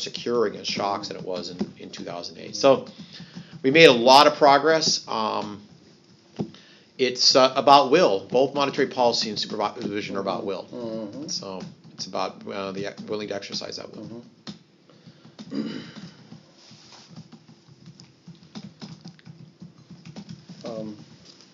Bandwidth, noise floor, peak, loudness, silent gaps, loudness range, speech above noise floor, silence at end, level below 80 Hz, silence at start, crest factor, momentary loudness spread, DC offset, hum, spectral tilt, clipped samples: 7.6 kHz; -54 dBFS; 0 dBFS; -21 LUFS; none; 21 LU; 32 dB; 0.5 s; -72 dBFS; 0 s; 24 dB; 26 LU; under 0.1%; none; -2 dB/octave; under 0.1%